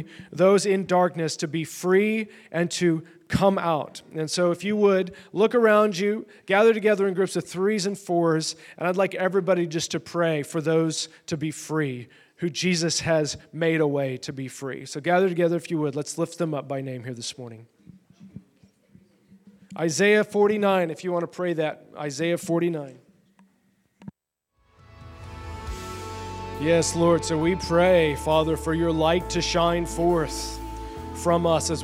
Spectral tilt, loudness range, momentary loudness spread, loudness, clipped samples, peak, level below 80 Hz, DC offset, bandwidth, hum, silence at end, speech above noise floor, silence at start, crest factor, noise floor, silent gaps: -5 dB/octave; 10 LU; 14 LU; -24 LUFS; under 0.1%; -6 dBFS; -46 dBFS; under 0.1%; 16 kHz; none; 0 s; 52 dB; 0 s; 18 dB; -75 dBFS; none